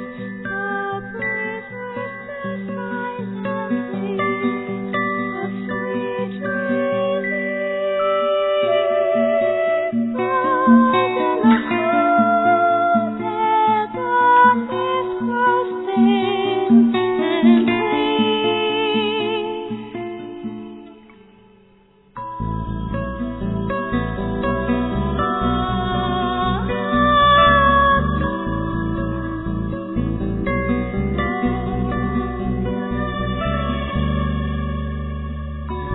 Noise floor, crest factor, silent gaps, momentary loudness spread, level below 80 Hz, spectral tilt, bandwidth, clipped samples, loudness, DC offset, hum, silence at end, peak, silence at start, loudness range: -52 dBFS; 16 dB; none; 13 LU; -34 dBFS; -10 dB/octave; 4.1 kHz; under 0.1%; -19 LUFS; under 0.1%; none; 0 s; -4 dBFS; 0 s; 9 LU